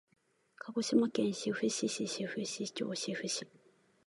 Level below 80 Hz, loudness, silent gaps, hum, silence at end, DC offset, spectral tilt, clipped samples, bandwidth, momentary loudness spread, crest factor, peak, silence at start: -82 dBFS; -35 LUFS; none; none; 0.6 s; under 0.1%; -3.5 dB/octave; under 0.1%; 11.5 kHz; 9 LU; 20 dB; -16 dBFS; 0.6 s